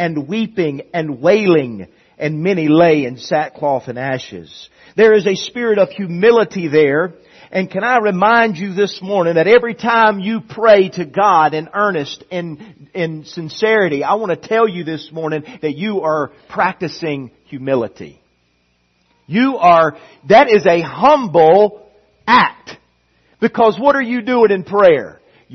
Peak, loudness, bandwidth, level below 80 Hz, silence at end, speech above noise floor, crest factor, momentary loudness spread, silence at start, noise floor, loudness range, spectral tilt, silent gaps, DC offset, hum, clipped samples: 0 dBFS; -14 LUFS; 6.4 kHz; -58 dBFS; 0 s; 46 dB; 14 dB; 13 LU; 0 s; -61 dBFS; 7 LU; -6 dB/octave; none; under 0.1%; none; under 0.1%